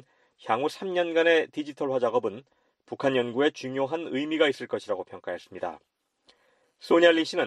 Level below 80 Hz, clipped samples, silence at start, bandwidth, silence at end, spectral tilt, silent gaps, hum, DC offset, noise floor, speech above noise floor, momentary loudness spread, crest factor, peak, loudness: -76 dBFS; under 0.1%; 0.45 s; 11.5 kHz; 0 s; -4.5 dB/octave; none; none; under 0.1%; -67 dBFS; 41 dB; 16 LU; 22 dB; -6 dBFS; -26 LUFS